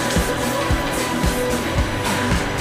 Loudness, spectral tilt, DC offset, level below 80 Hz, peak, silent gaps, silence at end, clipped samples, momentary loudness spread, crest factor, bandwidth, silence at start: -20 LUFS; -4.5 dB/octave; under 0.1%; -28 dBFS; -8 dBFS; none; 0 s; under 0.1%; 1 LU; 12 dB; 16 kHz; 0 s